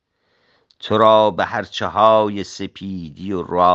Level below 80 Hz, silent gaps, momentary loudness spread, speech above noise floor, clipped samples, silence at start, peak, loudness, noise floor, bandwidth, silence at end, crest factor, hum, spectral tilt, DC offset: -58 dBFS; none; 17 LU; 47 dB; under 0.1%; 0.85 s; 0 dBFS; -17 LUFS; -64 dBFS; 8 kHz; 0 s; 18 dB; none; -5.5 dB/octave; under 0.1%